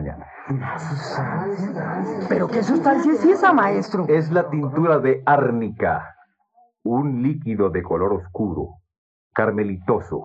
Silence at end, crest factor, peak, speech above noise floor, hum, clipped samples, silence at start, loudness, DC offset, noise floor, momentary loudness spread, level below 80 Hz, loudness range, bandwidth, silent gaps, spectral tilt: 0 s; 18 dB; -2 dBFS; 39 dB; none; under 0.1%; 0 s; -21 LUFS; under 0.1%; -59 dBFS; 11 LU; -52 dBFS; 6 LU; 8.2 kHz; 8.98-9.31 s; -8 dB/octave